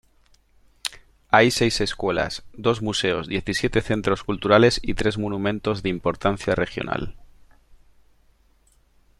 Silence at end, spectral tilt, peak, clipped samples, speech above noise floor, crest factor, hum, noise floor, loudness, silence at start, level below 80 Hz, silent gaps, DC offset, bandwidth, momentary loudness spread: 2 s; -5 dB/octave; -2 dBFS; under 0.1%; 38 dB; 22 dB; none; -60 dBFS; -22 LUFS; 0.85 s; -42 dBFS; none; under 0.1%; 14 kHz; 12 LU